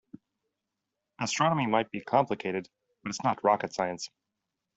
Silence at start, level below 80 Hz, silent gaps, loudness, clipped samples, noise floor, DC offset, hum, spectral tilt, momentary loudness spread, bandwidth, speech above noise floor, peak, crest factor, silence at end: 1.2 s; -70 dBFS; none; -29 LUFS; under 0.1%; -86 dBFS; under 0.1%; none; -4.5 dB/octave; 12 LU; 8.2 kHz; 57 dB; -10 dBFS; 22 dB; 0.7 s